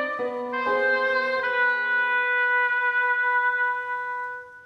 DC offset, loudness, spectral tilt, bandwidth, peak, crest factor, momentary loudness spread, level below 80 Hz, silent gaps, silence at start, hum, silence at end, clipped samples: under 0.1%; -23 LUFS; -3 dB/octave; 7 kHz; -12 dBFS; 12 dB; 8 LU; -72 dBFS; none; 0 s; none; 0 s; under 0.1%